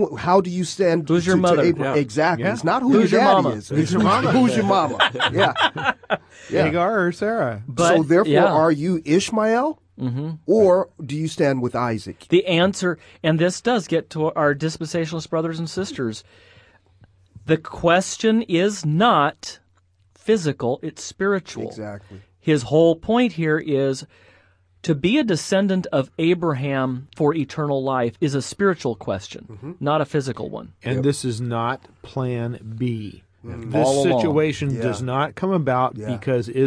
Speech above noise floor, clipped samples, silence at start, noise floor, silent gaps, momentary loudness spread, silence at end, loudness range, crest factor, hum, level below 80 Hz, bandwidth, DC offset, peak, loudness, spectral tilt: 40 dB; under 0.1%; 0 s; -60 dBFS; none; 12 LU; 0 s; 7 LU; 18 dB; none; -56 dBFS; 11 kHz; under 0.1%; -4 dBFS; -20 LUFS; -5.5 dB/octave